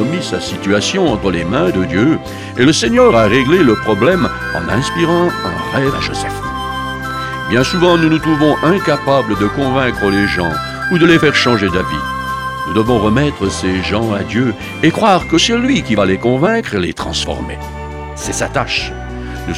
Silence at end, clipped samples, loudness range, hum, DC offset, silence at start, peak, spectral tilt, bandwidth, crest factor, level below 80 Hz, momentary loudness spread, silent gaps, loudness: 0 s; under 0.1%; 4 LU; none; under 0.1%; 0 s; 0 dBFS; -5 dB/octave; 15.5 kHz; 14 dB; -32 dBFS; 10 LU; none; -14 LUFS